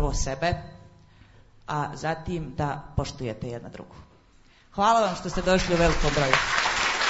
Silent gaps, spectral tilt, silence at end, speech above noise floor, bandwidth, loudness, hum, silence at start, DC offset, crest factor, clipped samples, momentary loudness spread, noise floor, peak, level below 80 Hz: none; -4 dB/octave; 0 s; 31 dB; 8 kHz; -25 LUFS; none; 0 s; under 0.1%; 24 dB; under 0.1%; 16 LU; -56 dBFS; -2 dBFS; -36 dBFS